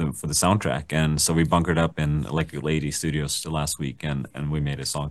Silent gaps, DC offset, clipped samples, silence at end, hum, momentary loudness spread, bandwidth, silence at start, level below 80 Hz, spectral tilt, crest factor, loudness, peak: none; 0.1%; under 0.1%; 0 s; none; 8 LU; 12.5 kHz; 0 s; -42 dBFS; -4.5 dB/octave; 18 dB; -24 LUFS; -6 dBFS